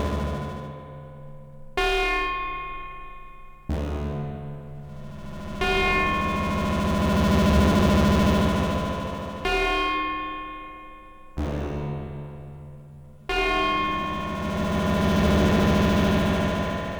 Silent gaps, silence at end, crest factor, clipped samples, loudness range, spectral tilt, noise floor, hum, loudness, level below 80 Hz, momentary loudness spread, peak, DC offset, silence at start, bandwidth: none; 0 s; 16 dB; under 0.1%; 9 LU; -6 dB/octave; -45 dBFS; none; -24 LUFS; -34 dBFS; 21 LU; -8 dBFS; under 0.1%; 0 s; over 20 kHz